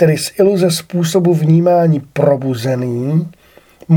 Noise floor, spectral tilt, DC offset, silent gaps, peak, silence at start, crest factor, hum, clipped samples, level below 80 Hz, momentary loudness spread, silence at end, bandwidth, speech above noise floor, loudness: -38 dBFS; -6.5 dB/octave; under 0.1%; none; 0 dBFS; 0 s; 14 dB; none; under 0.1%; -54 dBFS; 7 LU; 0 s; 18 kHz; 25 dB; -14 LUFS